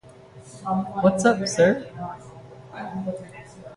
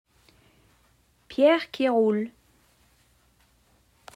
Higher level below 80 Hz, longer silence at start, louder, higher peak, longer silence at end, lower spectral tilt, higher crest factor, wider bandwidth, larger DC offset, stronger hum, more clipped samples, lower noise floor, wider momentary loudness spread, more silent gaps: first, -58 dBFS vs -68 dBFS; second, 0.05 s vs 1.3 s; about the same, -23 LUFS vs -24 LUFS; first, -4 dBFS vs -8 dBFS; second, 0 s vs 1.85 s; about the same, -5.5 dB/octave vs -6 dB/octave; about the same, 20 dB vs 20 dB; second, 11.5 kHz vs 15 kHz; neither; neither; neither; second, -46 dBFS vs -64 dBFS; first, 23 LU vs 14 LU; neither